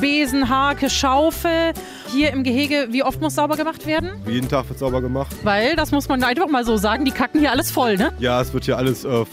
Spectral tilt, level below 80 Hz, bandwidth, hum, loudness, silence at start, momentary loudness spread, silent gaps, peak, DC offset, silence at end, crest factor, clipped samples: -4.5 dB/octave; -38 dBFS; 16 kHz; none; -19 LUFS; 0 s; 6 LU; none; -6 dBFS; under 0.1%; 0 s; 14 dB; under 0.1%